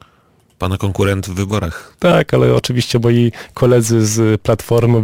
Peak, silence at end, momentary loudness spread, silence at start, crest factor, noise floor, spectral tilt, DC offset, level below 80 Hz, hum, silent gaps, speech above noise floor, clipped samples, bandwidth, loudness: -2 dBFS; 0 s; 7 LU; 0.6 s; 12 dB; -53 dBFS; -6 dB/octave; under 0.1%; -38 dBFS; none; none; 40 dB; under 0.1%; 16.5 kHz; -15 LUFS